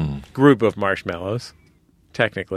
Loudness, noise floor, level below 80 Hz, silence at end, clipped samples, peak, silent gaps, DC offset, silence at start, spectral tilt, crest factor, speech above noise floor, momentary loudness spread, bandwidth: -20 LUFS; -56 dBFS; -46 dBFS; 0 s; under 0.1%; 0 dBFS; none; under 0.1%; 0 s; -7 dB/octave; 20 dB; 37 dB; 16 LU; 12 kHz